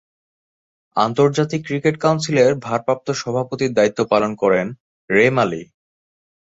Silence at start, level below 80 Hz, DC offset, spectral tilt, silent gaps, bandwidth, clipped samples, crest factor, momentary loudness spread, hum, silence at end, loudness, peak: 0.95 s; -58 dBFS; under 0.1%; -5.5 dB/octave; 4.80-5.08 s; 7.8 kHz; under 0.1%; 18 dB; 6 LU; none; 0.95 s; -18 LUFS; -2 dBFS